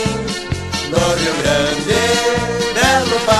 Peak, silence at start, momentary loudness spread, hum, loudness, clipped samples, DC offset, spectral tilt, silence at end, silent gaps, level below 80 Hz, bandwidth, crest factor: 0 dBFS; 0 s; 8 LU; none; -16 LUFS; under 0.1%; under 0.1%; -3.5 dB/octave; 0 s; none; -36 dBFS; 13 kHz; 16 dB